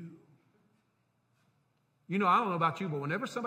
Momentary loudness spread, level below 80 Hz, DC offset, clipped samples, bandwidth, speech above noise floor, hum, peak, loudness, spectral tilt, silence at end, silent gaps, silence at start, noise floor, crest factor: 10 LU; -84 dBFS; under 0.1%; under 0.1%; 15.5 kHz; 45 dB; 60 Hz at -60 dBFS; -14 dBFS; -31 LUFS; -6.5 dB/octave; 0 s; none; 0 s; -75 dBFS; 20 dB